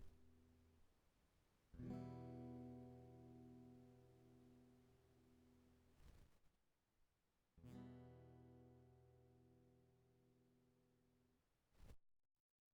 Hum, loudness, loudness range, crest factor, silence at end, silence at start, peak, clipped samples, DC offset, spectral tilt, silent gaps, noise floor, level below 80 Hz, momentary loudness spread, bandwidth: none; -60 LUFS; 9 LU; 22 dB; 0.5 s; 0 s; -42 dBFS; under 0.1%; under 0.1%; -8 dB/octave; none; -87 dBFS; -78 dBFS; 14 LU; 8.8 kHz